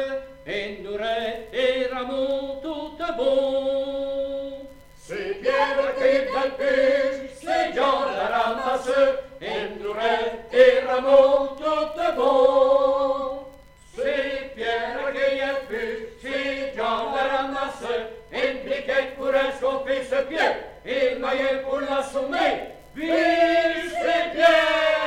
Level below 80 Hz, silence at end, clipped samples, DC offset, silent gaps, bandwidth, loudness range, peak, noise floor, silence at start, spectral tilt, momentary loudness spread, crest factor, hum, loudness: -52 dBFS; 0 s; under 0.1%; under 0.1%; none; 11 kHz; 7 LU; -2 dBFS; -47 dBFS; 0 s; -3.5 dB/octave; 13 LU; 20 dB; none; -23 LUFS